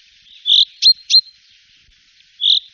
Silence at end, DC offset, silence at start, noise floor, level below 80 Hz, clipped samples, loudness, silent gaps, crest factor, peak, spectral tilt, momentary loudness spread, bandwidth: 0.15 s; under 0.1%; 0.45 s; -52 dBFS; -68 dBFS; under 0.1%; -12 LUFS; none; 14 dB; -2 dBFS; 6.5 dB/octave; 8 LU; 9 kHz